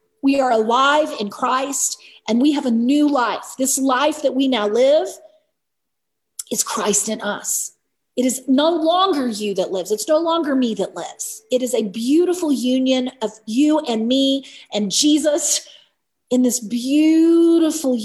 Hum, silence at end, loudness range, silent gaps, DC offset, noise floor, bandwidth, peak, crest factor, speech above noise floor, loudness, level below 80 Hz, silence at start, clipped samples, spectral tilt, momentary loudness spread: none; 0 s; 3 LU; none; under 0.1%; -80 dBFS; 14.5 kHz; -4 dBFS; 16 dB; 62 dB; -18 LUFS; -68 dBFS; 0.25 s; under 0.1%; -3 dB/octave; 9 LU